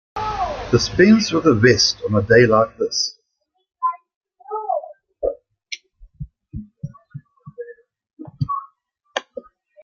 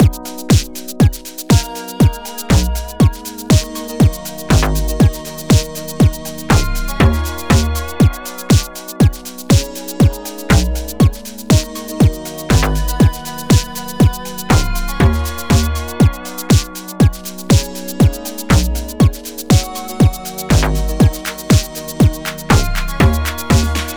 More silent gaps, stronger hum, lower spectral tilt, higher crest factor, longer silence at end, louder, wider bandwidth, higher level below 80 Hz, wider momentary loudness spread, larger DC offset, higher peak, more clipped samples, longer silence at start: first, 4.16-4.21 s, 8.13-8.17 s vs none; neither; about the same, -4.5 dB/octave vs -5.5 dB/octave; first, 20 dB vs 12 dB; first, 0.45 s vs 0 s; second, -18 LUFS vs -15 LUFS; second, 7.2 kHz vs over 20 kHz; second, -46 dBFS vs -20 dBFS; first, 25 LU vs 11 LU; neither; about the same, -2 dBFS vs -2 dBFS; neither; first, 0.15 s vs 0 s